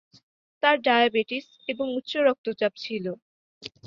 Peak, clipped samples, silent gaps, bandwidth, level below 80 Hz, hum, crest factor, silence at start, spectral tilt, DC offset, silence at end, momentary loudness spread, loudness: -6 dBFS; under 0.1%; 2.38-2.44 s, 3.22-3.61 s; 7.4 kHz; -74 dBFS; none; 22 dB; 0.65 s; -5 dB/octave; under 0.1%; 0.2 s; 15 LU; -25 LUFS